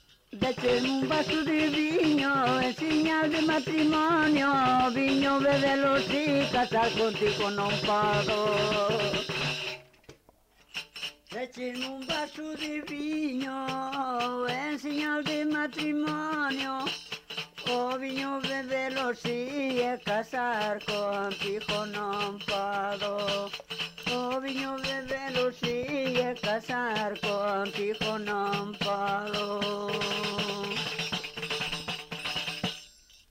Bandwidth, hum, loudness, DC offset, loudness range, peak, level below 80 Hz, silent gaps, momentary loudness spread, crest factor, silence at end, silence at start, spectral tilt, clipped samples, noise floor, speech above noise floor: 16 kHz; none; -29 LUFS; under 0.1%; 7 LU; -16 dBFS; -60 dBFS; none; 9 LU; 12 dB; 0.4 s; 0.3 s; -4.5 dB/octave; under 0.1%; -62 dBFS; 33 dB